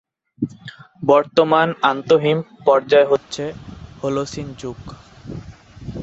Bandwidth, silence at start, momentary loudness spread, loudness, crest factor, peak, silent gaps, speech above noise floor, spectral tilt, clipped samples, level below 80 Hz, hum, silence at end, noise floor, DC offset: 8 kHz; 0.4 s; 22 LU; -18 LUFS; 18 dB; -2 dBFS; none; 20 dB; -5.5 dB/octave; under 0.1%; -48 dBFS; none; 0 s; -38 dBFS; under 0.1%